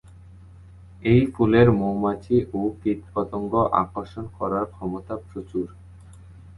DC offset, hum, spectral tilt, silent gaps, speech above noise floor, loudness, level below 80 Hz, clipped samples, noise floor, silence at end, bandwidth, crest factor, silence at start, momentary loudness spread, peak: under 0.1%; none; -9.5 dB/octave; none; 23 dB; -23 LUFS; -46 dBFS; under 0.1%; -46 dBFS; 0.15 s; 11.5 kHz; 20 dB; 0.3 s; 15 LU; -4 dBFS